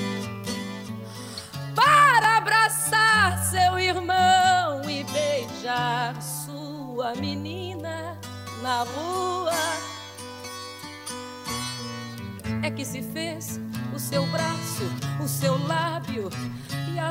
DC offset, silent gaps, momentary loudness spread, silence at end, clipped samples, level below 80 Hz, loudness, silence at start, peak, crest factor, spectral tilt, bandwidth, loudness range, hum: under 0.1%; none; 18 LU; 0 s; under 0.1%; -58 dBFS; -24 LUFS; 0 s; -6 dBFS; 18 dB; -3.5 dB/octave; 16.5 kHz; 12 LU; none